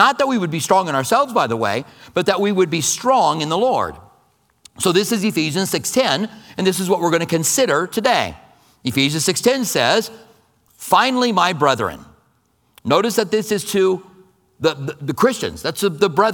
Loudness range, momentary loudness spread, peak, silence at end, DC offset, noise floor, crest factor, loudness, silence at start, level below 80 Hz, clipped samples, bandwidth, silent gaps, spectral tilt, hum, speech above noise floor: 2 LU; 8 LU; 0 dBFS; 0 s; under 0.1%; -61 dBFS; 18 dB; -18 LUFS; 0 s; -56 dBFS; under 0.1%; 19 kHz; none; -3.5 dB/octave; none; 44 dB